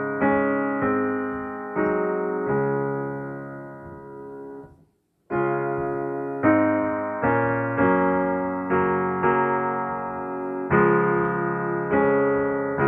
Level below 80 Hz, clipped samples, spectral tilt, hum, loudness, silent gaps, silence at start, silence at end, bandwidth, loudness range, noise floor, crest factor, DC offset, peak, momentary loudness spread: -54 dBFS; under 0.1%; -10.5 dB/octave; none; -23 LUFS; none; 0 s; 0 s; 3.6 kHz; 8 LU; -63 dBFS; 16 dB; under 0.1%; -8 dBFS; 16 LU